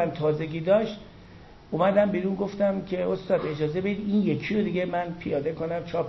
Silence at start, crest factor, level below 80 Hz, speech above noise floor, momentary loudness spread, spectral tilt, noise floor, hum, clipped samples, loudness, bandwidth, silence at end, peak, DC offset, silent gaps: 0 s; 16 dB; -54 dBFS; 22 dB; 6 LU; -8.5 dB/octave; -48 dBFS; none; under 0.1%; -26 LUFS; 6.2 kHz; 0 s; -10 dBFS; under 0.1%; none